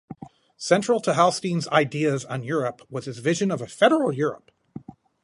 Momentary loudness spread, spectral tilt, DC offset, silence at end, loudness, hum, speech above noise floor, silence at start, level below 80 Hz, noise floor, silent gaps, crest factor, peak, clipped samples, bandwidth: 23 LU; -5 dB/octave; under 0.1%; 0.45 s; -23 LUFS; none; 20 dB; 0.1 s; -68 dBFS; -43 dBFS; none; 20 dB; -4 dBFS; under 0.1%; 11.5 kHz